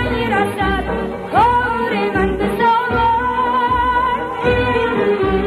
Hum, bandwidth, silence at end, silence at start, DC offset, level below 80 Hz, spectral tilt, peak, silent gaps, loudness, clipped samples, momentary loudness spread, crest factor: none; 13 kHz; 0 s; 0 s; under 0.1%; -32 dBFS; -6.5 dB/octave; -2 dBFS; none; -16 LUFS; under 0.1%; 4 LU; 14 dB